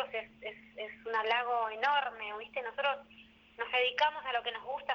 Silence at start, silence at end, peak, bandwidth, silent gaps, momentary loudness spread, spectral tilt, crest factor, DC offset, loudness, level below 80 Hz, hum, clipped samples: 0 s; 0 s; -16 dBFS; 7 kHz; none; 14 LU; -2 dB/octave; 18 dB; under 0.1%; -33 LUFS; -74 dBFS; none; under 0.1%